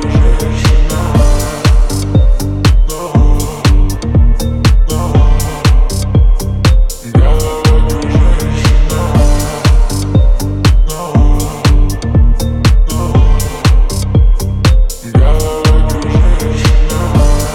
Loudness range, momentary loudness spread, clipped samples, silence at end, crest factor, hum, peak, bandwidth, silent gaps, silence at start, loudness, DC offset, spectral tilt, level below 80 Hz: 0 LU; 2 LU; under 0.1%; 0 s; 8 dB; none; 0 dBFS; 16 kHz; none; 0 s; -12 LUFS; under 0.1%; -6 dB/octave; -10 dBFS